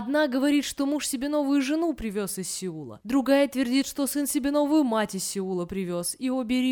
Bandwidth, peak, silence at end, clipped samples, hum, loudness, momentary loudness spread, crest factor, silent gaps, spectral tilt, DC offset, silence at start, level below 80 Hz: 19 kHz; -10 dBFS; 0 s; under 0.1%; none; -26 LUFS; 8 LU; 16 dB; none; -4 dB/octave; under 0.1%; 0 s; -56 dBFS